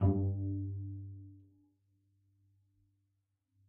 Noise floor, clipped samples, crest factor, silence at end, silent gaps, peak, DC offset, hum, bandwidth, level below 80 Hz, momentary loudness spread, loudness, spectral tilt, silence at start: -82 dBFS; under 0.1%; 22 dB; 2.3 s; none; -18 dBFS; under 0.1%; none; 1.6 kHz; -60 dBFS; 19 LU; -38 LUFS; -13 dB/octave; 0 s